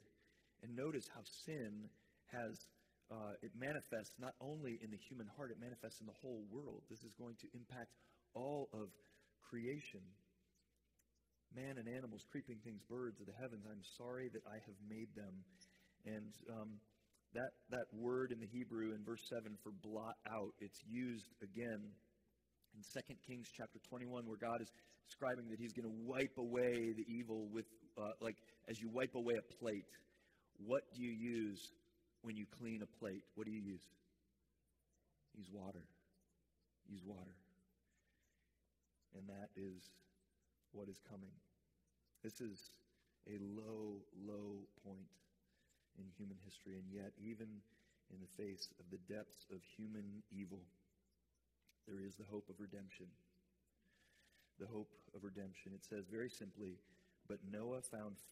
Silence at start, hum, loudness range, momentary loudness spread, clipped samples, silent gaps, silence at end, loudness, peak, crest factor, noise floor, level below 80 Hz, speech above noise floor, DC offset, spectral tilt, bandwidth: 0 s; none; 13 LU; 15 LU; under 0.1%; none; 0 s; -51 LUFS; -26 dBFS; 26 dB; -86 dBFS; -84 dBFS; 35 dB; under 0.1%; -5.5 dB/octave; 15.5 kHz